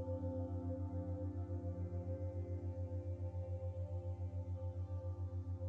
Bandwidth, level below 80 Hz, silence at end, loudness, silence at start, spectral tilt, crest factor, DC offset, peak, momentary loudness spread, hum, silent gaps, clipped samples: 2.5 kHz; -56 dBFS; 0 s; -45 LUFS; 0 s; -11 dB/octave; 12 dB; under 0.1%; -32 dBFS; 2 LU; none; none; under 0.1%